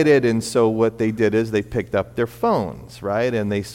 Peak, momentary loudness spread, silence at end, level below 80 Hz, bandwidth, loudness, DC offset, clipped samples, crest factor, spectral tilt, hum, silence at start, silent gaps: -4 dBFS; 7 LU; 0 s; -48 dBFS; 16.5 kHz; -21 LUFS; under 0.1%; under 0.1%; 16 dB; -6.5 dB/octave; none; 0 s; none